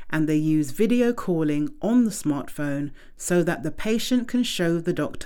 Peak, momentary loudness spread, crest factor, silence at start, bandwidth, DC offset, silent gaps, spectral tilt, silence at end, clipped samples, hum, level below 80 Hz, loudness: -10 dBFS; 7 LU; 14 dB; 0 s; 18.5 kHz; under 0.1%; none; -5.5 dB/octave; 0 s; under 0.1%; none; -46 dBFS; -24 LUFS